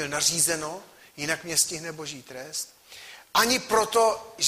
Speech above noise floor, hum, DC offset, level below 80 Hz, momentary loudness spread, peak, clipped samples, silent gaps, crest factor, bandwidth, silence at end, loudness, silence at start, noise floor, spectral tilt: 21 dB; none; under 0.1%; -62 dBFS; 18 LU; -8 dBFS; under 0.1%; none; 20 dB; 15.5 kHz; 0 s; -24 LUFS; 0 s; -47 dBFS; -1 dB/octave